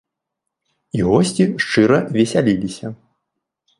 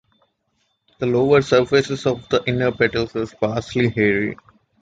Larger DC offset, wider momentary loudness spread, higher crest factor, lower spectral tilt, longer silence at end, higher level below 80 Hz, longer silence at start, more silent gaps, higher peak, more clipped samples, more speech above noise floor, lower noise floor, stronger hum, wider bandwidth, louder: neither; first, 13 LU vs 9 LU; about the same, 18 dB vs 18 dB; about the same, -6 dB/octave vs -6 dB/octave; first, 0.85 s vs 0.45 s; about the same, -48 dBFS vs -48 dBFS; about the same, 0.95 s vs 1 s; neither; about the same, 0 dBFS vs -2 dBFS; neither; first, 64 dB vs 50 dB; first, -80 dBFS vs -69 dBFS; neither; first, 11.5 kHz vs 7.8 kHz; about the same, -17 LUFS vs -19 LUFS